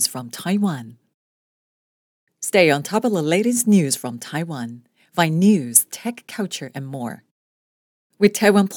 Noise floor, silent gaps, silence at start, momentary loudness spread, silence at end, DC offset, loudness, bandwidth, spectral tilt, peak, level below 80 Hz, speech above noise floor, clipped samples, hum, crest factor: under -90 dBFS; 1.14-2.27 s, 7.31-8.10 s; 0 s; 14 LU; 0 s; under 0.1%; -19 LUFS; over 20 kHz; -4.5 dB/octave; 0 dBFS; -72 dBFS; over 71 dB; under 0.1%; none; 20 dB